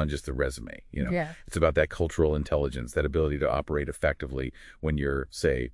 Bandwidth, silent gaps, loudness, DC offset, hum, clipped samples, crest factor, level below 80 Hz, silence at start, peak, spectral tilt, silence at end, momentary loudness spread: 12 kHz; none; -29 LUFS; under 0.1%; none; under 0.1%; 20 dB; -38 dBFS; 0 s; -8 dBFS; -6.5 dB/octave; 0 s; 9 LU